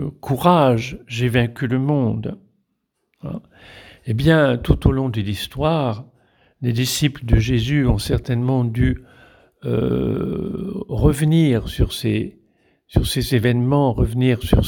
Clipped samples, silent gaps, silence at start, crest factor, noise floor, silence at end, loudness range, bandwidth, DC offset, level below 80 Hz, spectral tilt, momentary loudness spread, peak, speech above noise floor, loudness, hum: under 0.1%; none; 0 s; 20 dB; -73 dBFS; 0 s; 2 LU; 19.5 kHz; under 0.1%; -30 dBFS; -6.5 dB/octave; 12 LU; 0 dBFS; 55 dB; -19 LUFS; none